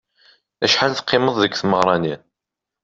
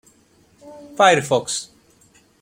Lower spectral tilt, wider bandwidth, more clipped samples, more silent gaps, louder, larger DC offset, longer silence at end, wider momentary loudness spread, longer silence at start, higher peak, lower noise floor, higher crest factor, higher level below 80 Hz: about the same, -4 dB/octave vs -3 dB/octave; second, 8 kHz vs 16.5 kHz; neither; neither; about the same, -18 LUFS vs -18 LUFS; neither; about the same, 0.65 s vs 0.75 s; second, 7 LU vs 23 LU; about the same, 0.6 s vs 0.65 s; about the same, -2 dBFS vs -2 dBFS; first, -85 dBFS vs -56 dBFS; about the same, 18 dB vs 20 dB; about the same, -58 dBFS vs -62 dBFS